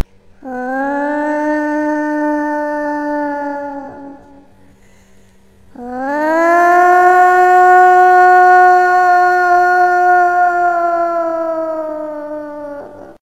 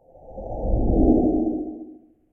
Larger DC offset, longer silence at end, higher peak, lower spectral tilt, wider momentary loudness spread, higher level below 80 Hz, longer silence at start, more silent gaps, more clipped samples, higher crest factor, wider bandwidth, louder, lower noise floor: first, 0.4% vs under 0.1%; second, 0.1 s vs 0.35 s; first, 0 dBFS vs -6 dBFS; second, -4.5 dB/octave vs -15 dB/octave; second, 19 LU vs 22 LU; second, -54 dBFS vs -28 dBFS; first, 0.45 s vs 0.25 s; neither; neither; about the same, 12 dB vs 16 dB; first, 12.5 kHz vs 1 kHz; first, -11 LUFS vs -22 LUFS; about the same, -47 dBFS vs -45 dBFS